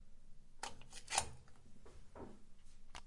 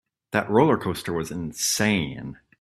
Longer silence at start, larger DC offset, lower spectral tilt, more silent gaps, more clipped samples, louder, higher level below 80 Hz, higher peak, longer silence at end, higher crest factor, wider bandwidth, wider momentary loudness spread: second, 0 s vs 0.3 s; neither; second, -1 dB/octave vs -4 dB/octave; neither; neither; second, -45 LUFS vs -24 LUFS; about the same, -58 dBFS vs -54 dBFS; second, -18 dBFS vs -4 dBFS; second, 0 s vs 0.25 s; first, 32 dB vs 20 dB; second, 11.5 kHz vs 15.5 kHz; first, 26 LU vs 12 LU